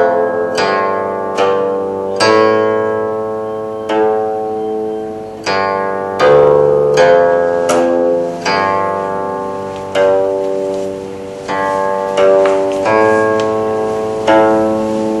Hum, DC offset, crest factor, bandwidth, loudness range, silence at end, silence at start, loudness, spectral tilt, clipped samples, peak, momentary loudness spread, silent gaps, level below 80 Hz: none; under 0.1%; 14 dB; 12 kHz; 5 LU; 0 s; 0 s; -13 LUFS; -5 dB/octave; under 0.1%; 0 dBFS; 11 LU; none; -50 dBFS